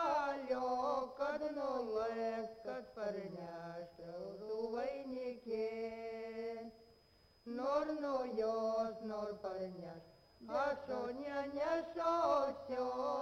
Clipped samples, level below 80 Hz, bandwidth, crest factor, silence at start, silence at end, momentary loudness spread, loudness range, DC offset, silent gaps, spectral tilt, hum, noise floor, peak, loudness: under 0.1%; -72 dBFS; 11 kHz; 18 dB; 0 s; 0 s; 11 LU; 5 LU; under 0.1%; none; -5.5 dB/octave; none; -69 dBFS; -22 dBFS; -41 LUFS